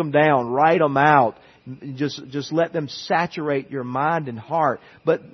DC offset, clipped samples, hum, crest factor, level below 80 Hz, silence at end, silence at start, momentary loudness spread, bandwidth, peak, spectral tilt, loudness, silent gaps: under 0.1%; under 0.1%; none; 20 dB; -66 dBFS; 0.05 s; 0 s; 11 LU; 6.4 kHz; 0 dBFS; -6.5 dB/octave; -21 LUFS; none